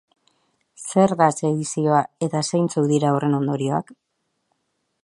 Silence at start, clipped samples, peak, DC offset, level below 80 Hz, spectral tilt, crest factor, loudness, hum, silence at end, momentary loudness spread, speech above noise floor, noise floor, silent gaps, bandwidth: 0.8 s; under 0.1%; -2 dBFS; under 0.1%; -66 dBFS; -6 dB/octave; 20 dB; -21 LUFS; none; 1.1 s; 6 LU; 53 dB; -73 dBFS; none; 11.5 kHz